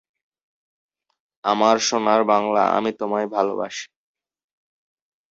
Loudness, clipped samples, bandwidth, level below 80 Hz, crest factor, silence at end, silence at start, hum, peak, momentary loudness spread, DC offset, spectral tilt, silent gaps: -20 LUFS; under 0.1%; 8 kHz; -68 dBFS; 22 dB; 1.45 s; 1.45 s; none; -2 dBFS; 11 LU; under 0.1%; -3.5 dB/octave; none